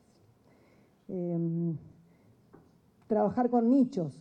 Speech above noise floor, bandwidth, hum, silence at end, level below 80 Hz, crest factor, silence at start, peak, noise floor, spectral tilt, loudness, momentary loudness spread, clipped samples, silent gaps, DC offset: 36 dB; 7.6 kHz; none; 0 s; -74 dBFS; 16 dB; 1.1 s; -16 dBFS; -63 dBFS; -10 dB/octave; -29 LUFS; 12 LU; under 0.1%; none; under 0.1%